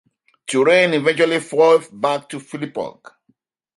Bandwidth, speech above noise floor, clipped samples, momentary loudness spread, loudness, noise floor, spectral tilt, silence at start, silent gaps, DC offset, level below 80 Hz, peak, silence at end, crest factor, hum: 11.5 kHz; 47 dB; under 0.1%; 16 LU; -17 LUFS; -64 dBFS; -4.5 dB/octave; 0.5 s; none; under 0.1%; -70 dBFS; -2 dBFS; 0.9 s; 18 dB; none